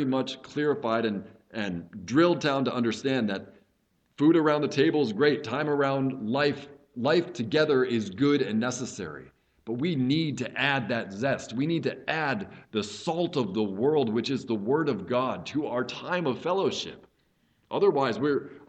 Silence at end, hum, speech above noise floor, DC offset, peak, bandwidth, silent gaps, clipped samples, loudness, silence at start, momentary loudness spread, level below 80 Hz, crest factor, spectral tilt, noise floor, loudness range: 0.05 s; none; 44 dB; under 0.1%; -8 dBFS; 8.8 kHz; none; under 0.1%; -27 LUFS; 0 s; 10 LU; -68 dBFS; 18 dB; -6 dB/octave; -71 dBFS; 3 LU